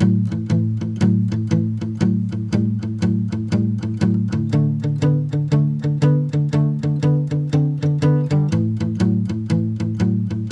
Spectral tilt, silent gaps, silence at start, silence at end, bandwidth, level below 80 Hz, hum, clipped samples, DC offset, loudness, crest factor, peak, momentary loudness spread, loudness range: -8.5 dB/octave; none; 0 s; 0 s; 8.2 kHz; -48 dBFS; none; under 0.1%; under 0.1%; -19 LUFS; 14 dB; -4 dBFS; 4 LU; 2 LU